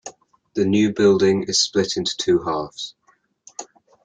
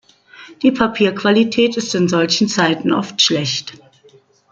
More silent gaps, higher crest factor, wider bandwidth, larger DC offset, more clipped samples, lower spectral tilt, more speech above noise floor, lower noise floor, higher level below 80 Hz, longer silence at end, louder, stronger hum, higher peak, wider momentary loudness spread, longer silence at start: neither; about the same, 16 dB vs 16 dB; about the same, 9.4 kHz vs 8.8 kHz; neither; neither; about the same, -4 dB/octave vs -4 dB/octave; about the same, 34 dB vs 34 dB; about the same, -53 dBFS vs -50 dBFS; about the same, -58 dBFS vs -54 dBFS; second, 0.4 s vs 0.75 s; second, -19 LUFS vs -16 LUFS; neither; about the same, -4 dBFS vs -2 dBFS; first, 20 LU vs 5 LU; second, 0.05 s vs 0.4 s